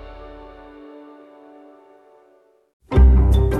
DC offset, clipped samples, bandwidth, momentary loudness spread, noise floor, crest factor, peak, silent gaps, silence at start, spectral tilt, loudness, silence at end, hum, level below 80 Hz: under 0.1%; under 0.1%; 3.8 kHz; 28 LU; -56 dBFS; 16 dB; -4 dBFS; 2.73-2.80 s; 0.05 s; -9 dB/octave; -16 LUFS; 0 s; none; -20 dBFS